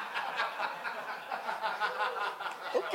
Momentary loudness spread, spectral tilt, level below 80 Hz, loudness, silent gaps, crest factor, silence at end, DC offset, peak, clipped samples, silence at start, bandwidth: 6 LU; -2 dB/octave; under -90 dBFS; -35 LUFS; none; 22 dB; 0 s; under 0.1%; -14 dBFS; under 0.1%; 0 s; 16 kHz